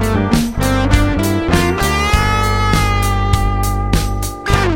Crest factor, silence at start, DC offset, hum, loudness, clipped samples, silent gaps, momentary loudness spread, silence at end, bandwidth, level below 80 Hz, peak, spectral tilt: 14 dB; 0 s; under 0.1%; none; -15 LUFS; under 0.1%; none; 4 LU; 0 s; 17 kHz; -20 dBFS; 0 dBFS; -5 dB/octave